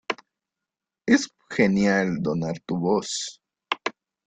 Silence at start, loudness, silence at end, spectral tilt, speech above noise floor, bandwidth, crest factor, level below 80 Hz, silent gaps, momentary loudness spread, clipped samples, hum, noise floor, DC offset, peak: 0.1 s; -25 LUFS; 0.35 s; -5 dB/octave; 64 dB; 9.4 kHz; 20 dB; -62 dBFS; none; 12 LU; under 0.1%; none; -87 dBFS; under 0.1%; -6 dBFS